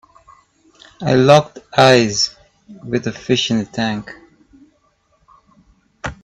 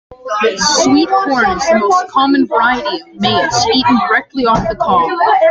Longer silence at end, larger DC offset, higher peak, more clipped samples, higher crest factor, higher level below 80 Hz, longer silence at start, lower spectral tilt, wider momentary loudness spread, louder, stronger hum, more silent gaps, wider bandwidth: about the same, 0.1 s vs 0 s; neither; about the same, 0 dBFS vs 0 dBFS; neither; first, 18 dB vs 12 dB; second, -50 dBFS vs -40 dBFS; first, 1 s vs 0.1 s; about the same, -4.5 dB/octave vs -3.5 dB/octave; first, 19 LU vs 5 LU; second, -15 LUFS vs -12 LUFS; neither; neither; first, 12 kHz vs 9.4 kHz